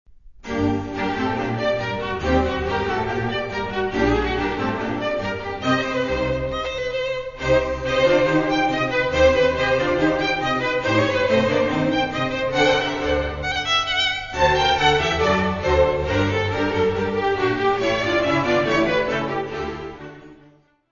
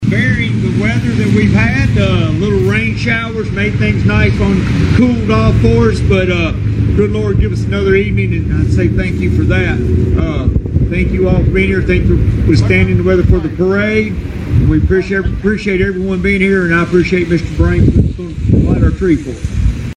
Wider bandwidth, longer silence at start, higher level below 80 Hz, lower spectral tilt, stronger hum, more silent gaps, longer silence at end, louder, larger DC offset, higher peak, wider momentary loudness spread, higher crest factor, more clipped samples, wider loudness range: second, 7.4 kHz vs 9.6 kHz; first, 0.25 s vs 0 s; second, -38 dBFS vs -20 dBFS; second, -5 dB/octave vs -8 dB/octave; neither; neither; first, 0.55 s vs 0.05 s; second, -21 LUFS vs -12 LUFS; neither; second, -4 dBFS vs 0 dBFS; first, 8 LU vs 5 LU; first, 18 dB vs 12 dB; neither; about the same, 4 LU vs 2 LU